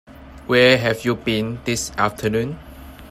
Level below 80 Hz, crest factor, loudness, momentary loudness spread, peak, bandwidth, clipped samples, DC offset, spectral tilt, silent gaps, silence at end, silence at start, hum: -44 dBFS; 20 dB; -19 LUFS; 13 LU; 0 dBFS; 15.5 kHz; under 0.1%; under 0.1%; -4.5 dB/octave; none; 0 s; 0.1 s; none